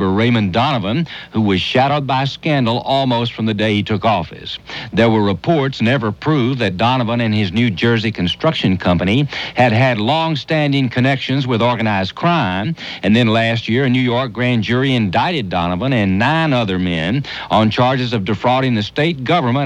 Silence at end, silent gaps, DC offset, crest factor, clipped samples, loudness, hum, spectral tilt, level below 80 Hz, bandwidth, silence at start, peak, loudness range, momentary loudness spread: 0 s; none; under 0.1%; 14 dB; under 0.1%; -16 LUFS; none; -7 dB/octave; -46 dBFS; 9.2 kHz; 0 s; -2 dBFS; 1 LU; 5 LU